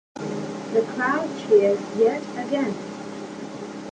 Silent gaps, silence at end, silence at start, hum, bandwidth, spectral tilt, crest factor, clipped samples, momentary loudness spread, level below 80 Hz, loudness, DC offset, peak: none; 0 s; 0.15 s; none; 9.4 kHz; -5.5 dB/octave; 18 dB; under 0.1%; 16 LU; -66 dBFS; -23 LUFS; under 0.1%; -6 dBFS